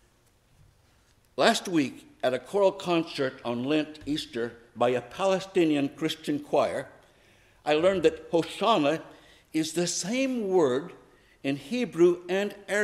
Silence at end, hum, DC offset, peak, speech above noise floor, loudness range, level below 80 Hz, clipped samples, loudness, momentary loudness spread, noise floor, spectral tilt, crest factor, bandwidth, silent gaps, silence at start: 0 s; none; under 0.1%; -8 dBFS; 37 dB; 2 LU; -64 dBFS; under 0.1%; -27 LUFS; 10 LU; -64 dBFS; -4.5 dB/octave; 20 dB; 14 kHz; none; 1.4 s